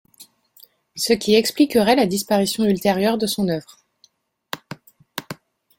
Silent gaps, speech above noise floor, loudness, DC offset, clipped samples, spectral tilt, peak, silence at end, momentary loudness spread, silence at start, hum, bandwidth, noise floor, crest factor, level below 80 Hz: none; 41 dB; -19 LUFS; under 0.1%; under 0.1%; -4.5 dB/octave; -2 dBFS; 0.45 s; 21 LU; 0.2 s; none; 17 kHz; -60 dBFS; 20 dB; -58 dBFS